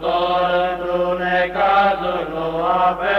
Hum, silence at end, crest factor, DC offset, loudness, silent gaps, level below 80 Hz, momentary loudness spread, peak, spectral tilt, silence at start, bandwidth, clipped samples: none; 0 s; 14 dB; under 0.1%; -18 LUFS; none; -44 dBFS; 6 LU; -4 dBFS; -6.5 dB/octave; 0 s; 6.8 kHz; under 0.1%